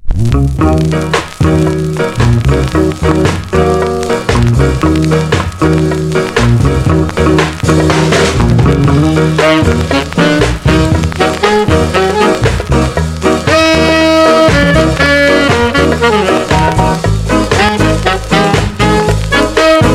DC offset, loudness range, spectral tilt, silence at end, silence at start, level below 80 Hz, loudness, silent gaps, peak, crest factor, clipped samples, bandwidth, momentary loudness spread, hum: under 0.1%; 3 LU; -6 dB/octave; 0 s; 0 s; -20 dBFS; -10 LUFS; none; 0 dBFS; 10 dB; 0.3%; 15 kHz; 5 LU; none